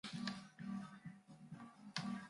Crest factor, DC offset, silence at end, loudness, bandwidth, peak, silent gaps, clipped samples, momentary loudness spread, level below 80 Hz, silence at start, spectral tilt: 28 dB; under 0.1%; 0 s; -50 LUFS; 11.5 kHz; -22 dBFS; none; under 0.1%; 12 LU; -82 dBFS; 0.05 s; -4.5 dB/octave